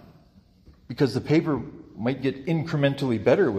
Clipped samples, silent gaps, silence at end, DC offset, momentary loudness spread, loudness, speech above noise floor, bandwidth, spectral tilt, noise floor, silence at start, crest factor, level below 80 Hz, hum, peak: under 0.1%; none; 0 s; under 0.1%; 9 LU; -25 LUFS; 33 dB; 13.5 kHz; -7.5 dB/octave; -56 dBFS; 0.9 s; 18 dB; -56 dBFS; none; -8 dBFS